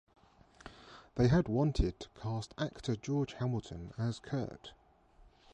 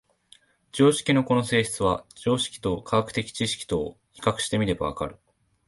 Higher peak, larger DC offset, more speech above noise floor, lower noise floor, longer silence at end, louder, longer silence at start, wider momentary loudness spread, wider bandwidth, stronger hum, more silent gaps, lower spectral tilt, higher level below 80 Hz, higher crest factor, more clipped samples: second, -18 dBFS vs -6 dBFS; neither; second, 29 dB vs 34 dB; first, -63 dBFS vs -58 dBFS; first, 0.85 s vs 0.55 s; second, -35 LUFS vs -25 LUFS; about the same, 0.65 s vs 0.75 s; first, 24 LU vs 9 LU; second, 9.6 kHz vs 12 kHz; neither; neither; first, -7 dB/octave vs -5 dB/octave; about the same, -48 dBFS vs -50 dBFS; about the same, 18 dB vs 20 dB; neither